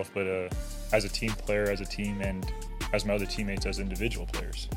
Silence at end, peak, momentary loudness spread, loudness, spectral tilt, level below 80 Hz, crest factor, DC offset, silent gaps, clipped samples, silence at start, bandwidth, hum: 0 s; -10 dBFS; 7 LU; -32 LUFS; -5 dB/octave; -36 dBFS; 22 dB; under 0.1%; none; under 0.1%; 0 s; 17 kHz; none